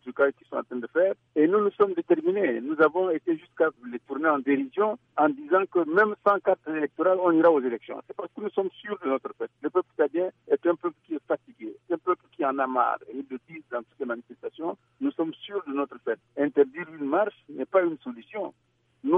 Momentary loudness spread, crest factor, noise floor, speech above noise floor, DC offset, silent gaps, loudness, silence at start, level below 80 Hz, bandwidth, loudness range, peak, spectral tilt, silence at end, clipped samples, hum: 13 LU; 18 dB; -47 dBFS; 21 dB; under 0.1%; none; -26 LUFS; 0.05 s; -78 dBFS; 4.4 kHz; 6 LU; -8 dBFS; -8.5 dB/octave; 0 s; under 0.1%; none